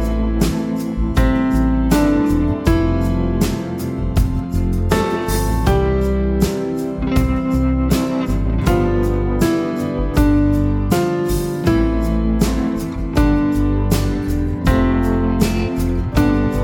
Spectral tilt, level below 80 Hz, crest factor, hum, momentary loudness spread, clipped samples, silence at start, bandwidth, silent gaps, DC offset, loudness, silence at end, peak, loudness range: -7 dB/octave; -22 dBFS; 16 dB; none; 5 LU; under 0.1%; 0 s; 18 kHz; none; under 0.1%; -18 LUFS; 0 s; 0 dBFS; 1 LU